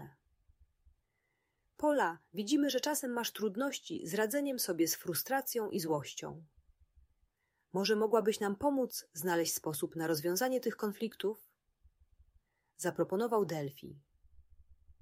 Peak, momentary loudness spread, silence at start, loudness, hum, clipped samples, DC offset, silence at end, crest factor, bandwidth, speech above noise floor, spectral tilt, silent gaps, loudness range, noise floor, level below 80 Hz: -16 dBFS; 9 LU; 0 s; -35 LUFS; none; under 0.1%; under 0.1%; 0.1 s; 20 dB; 16 kHz; 47 dB; -4 dB/octave; none; 4 LU; -82 dBFS; -72 dBFS